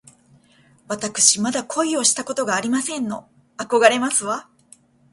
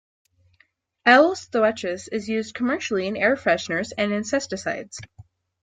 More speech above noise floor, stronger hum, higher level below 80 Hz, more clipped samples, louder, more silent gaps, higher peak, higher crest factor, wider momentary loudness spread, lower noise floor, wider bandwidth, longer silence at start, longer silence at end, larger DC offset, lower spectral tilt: second, 35 dB vs 42 dB; neither; about the same, -68 dBFS vs -64 dBFS; neither; first, -19 LUFS vs -22 LUFS; neither; about the same, 0 dBFS vs -2 dBFS; about the same, 22 dB vs 22 dB; about the same, 14 LU vs 13 LU; second, -55 dBFS vs -64 dBFS; first, 11.5 kHz vs 9.4 kHz; second, 0.9 s vs 1.05 s; first, 0.7 s vs 0.4 s; neither; second, -1.5 dB/octave vs -4 dB/octave